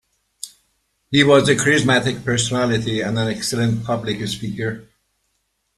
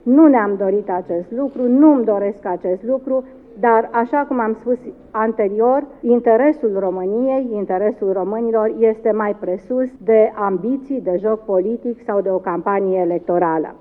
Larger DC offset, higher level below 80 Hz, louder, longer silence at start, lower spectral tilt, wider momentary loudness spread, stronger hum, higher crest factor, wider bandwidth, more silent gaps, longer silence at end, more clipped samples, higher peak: neither; first, -50 dBFS vs -56 dBFS; about the same, -18 LUFS vs -18 LUFS; first, 0.45 s vs 0.05 s; second, -4.5 dB/octave vs -11 dB/octave; first, 19 LU vs 9 LU; neither; about the same, 18 dB vs 16 dB; first, 13 kHz vs 3.3 kHz; neither; first, 0.95 s vs 0.05 s; neither; about the same, -2 dBFS vs 0 dBFS